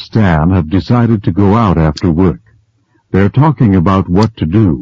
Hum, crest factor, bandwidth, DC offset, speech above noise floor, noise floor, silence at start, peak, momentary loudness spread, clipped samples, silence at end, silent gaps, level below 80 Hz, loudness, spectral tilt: none; 10 dB; 7.6 kHz; 0.4%; 46 dB; -55 dBFS; 0 s; 0 dBFS; 4 LU; 0.1%; 0 s; none; -28 dBFS; -11 LUFS; -9 dB/octave